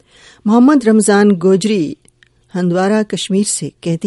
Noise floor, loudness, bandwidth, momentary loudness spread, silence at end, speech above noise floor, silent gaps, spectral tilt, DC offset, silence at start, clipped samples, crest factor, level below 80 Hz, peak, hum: -51 dBFS; -13 LUFS; 11.5 kHz; 11 LU; 0 s; 39 dB; none; -5.5 dB/octave; under 0.1%; 0.45 s; under 0.1%; 14 dB; -56 dBFS; 0 dBFS; none